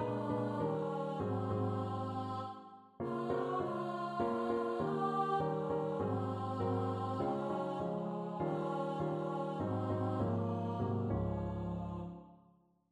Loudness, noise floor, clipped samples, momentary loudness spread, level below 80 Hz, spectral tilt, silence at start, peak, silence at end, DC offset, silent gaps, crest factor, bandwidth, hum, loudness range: -38 LUFS; -69 dBFS; under 0.1%; 5 LU; -60 dBFS; -9 dB/octave; 0 s; -22 dBFS; 0.55 s; under 0.1%; none; 14 dB; 10 kHz; none; 2 LU